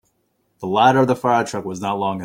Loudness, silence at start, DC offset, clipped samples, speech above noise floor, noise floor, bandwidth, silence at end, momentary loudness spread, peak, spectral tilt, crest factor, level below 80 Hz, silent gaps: -18 LUFS; 0.6 s; under 0.1%; under 0.1%; 49 dB; -67 dBFS; 16.5 kHz; 0 s; 11 LU; -2 dBFS; -5.5 dB/octave; 18 dB; -60 dBFS; none